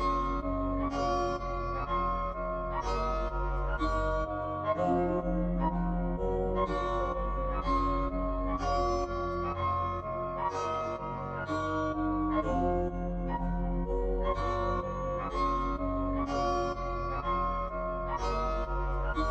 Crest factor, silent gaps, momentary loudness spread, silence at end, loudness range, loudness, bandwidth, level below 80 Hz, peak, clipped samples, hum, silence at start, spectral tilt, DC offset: 14 dB; none; 4 LU; 0 s; 1 LU; -32 LUFS; 8 kHz; -36 dBFS; -18 dBFS; under 0.1%; none; 0 s; -7.5 dB/octave; under 0.1%